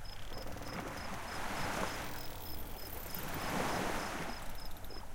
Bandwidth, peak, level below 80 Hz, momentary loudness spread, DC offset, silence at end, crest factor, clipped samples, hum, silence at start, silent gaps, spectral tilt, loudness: 17 kHz; -20 dBFS; -48 dBFS; 11 LU; under 0.1%; 0 s; 18 dB; under 0.1%; none; 0 s; none; -4 dB/octave; -41 LUFS